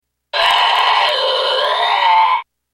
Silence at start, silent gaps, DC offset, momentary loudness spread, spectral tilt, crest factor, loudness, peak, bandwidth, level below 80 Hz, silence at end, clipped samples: 0.35 s; none; under 0.1%; 4 LU; 1 dB/octave; 14 dB; -13 LUFS; -2 dBFS; 16.5 kHz; -60 dBFS; 0.3 s; under 0.1%